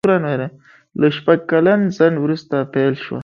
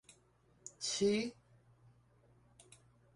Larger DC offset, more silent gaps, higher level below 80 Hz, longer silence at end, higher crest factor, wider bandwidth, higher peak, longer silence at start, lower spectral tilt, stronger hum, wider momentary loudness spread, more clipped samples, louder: neither; neither; first, -60 dBFS vs -76 dBFS; second, 0 s vs 1.85 s; about the same, 16 dB vs 20 dB; second, 7 kHz vs 11.5 kHz; first, 0 dBFS vs -22 dBFS; second, 0.05 s vs 0.65 s; first, -8 dB/octave vs -3.5 dB/octave; neither; second, 9 LU vs 21 LU; neither; first, -17 LUFS vs -37 LUFS